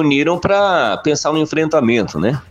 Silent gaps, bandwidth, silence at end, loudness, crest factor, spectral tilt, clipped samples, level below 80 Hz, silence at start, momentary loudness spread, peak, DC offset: none; 9.6 kHz; 0.1 s; -15 LUFS; 14 dB; -5 dB/octave; under 0.1%; -46 dBFS; 0 s; 3 LU; -2 dBFS; under 0.1%